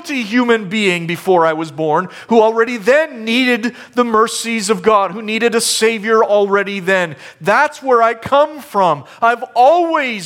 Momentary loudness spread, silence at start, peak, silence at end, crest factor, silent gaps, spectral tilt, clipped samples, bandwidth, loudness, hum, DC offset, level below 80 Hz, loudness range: 5 LU; 0 s; 0 dBFS; 0 s; 14 dB; none; -3.5 dB/octave; under 0.1%; 16.5 kHz; -14 LUFS; none; under 0.1%; -60 dBFS; 1 LU